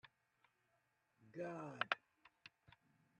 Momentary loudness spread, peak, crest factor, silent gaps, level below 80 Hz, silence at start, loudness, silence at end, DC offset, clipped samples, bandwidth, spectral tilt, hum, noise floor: 21 LU; -20 dBFS; 34 dB; none; under -90 dBFS; 0.05 s; -46 LUFS; 0.7 s; under 0.1%; under 0.1%; 10.5 kHz; -5 dB/octave; none; -83 dBFS